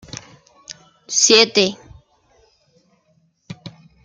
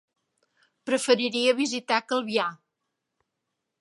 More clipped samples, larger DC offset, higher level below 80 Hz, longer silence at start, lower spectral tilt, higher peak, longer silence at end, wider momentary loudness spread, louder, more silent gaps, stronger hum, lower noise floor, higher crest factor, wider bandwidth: neither; neither; first, -58 dBFS vs -82 dBFS; second, 0.15 s vs 0.85 s; second, -1 dB/octave vs -2.5 dB/octave; first, 0 dBFS vs -4 dBFS; second, 0.35 s vs 1.25 s; first, 28 LU vs 7 LU; first, -14 LUFS vs -25 LUFS; neither; neither; second, -62 dBFS vs -82 dBFS; about the same, 22 dB vs 24 dB; about the same, 10.5 kHz vs 11.5 kHz